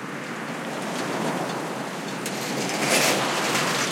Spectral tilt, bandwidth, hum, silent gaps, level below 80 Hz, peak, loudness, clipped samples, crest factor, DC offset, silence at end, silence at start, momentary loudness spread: -2.5 dB/octave; 16.5 kHz; none; none; -74 dBFS; -6 dBFS; -25 LUFS; under 0.1%; 20 dB; under 0.1%; 0 s; 0 s; 11 LU